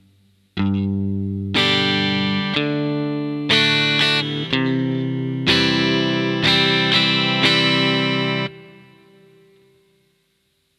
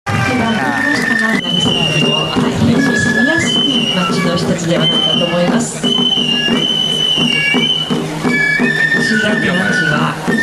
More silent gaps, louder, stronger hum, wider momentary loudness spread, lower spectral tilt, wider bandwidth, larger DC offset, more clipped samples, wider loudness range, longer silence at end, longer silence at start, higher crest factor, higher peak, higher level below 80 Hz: neither; second, -18 LUFS vs -12 LUFS; neither; first, 9 LU vs 4 LU; about the same, -5 dB/octave vs -4 dB/octave; about the same, 13 kHz vs 13.5 kHz; neither; neither; first, 4 LU vs 1 LU; first, 2.1 s vs 0 s; first, 0.55 s vs 0.05 s; first, 20 dB vs 12 dB; about the same, 0 dBFS vs -2 dBFS; second, -54 dBFS vs -44 dBFS